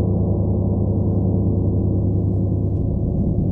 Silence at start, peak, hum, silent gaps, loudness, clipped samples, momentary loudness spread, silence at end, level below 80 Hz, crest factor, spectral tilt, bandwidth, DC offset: 0 s; -8 dBFS; none; none; -20 LUFS; under 0.1%; 2 LU; 0 s; -28 dBFS; 10 dB; -15 dB/octave; 1.2 kHz; under 0.1%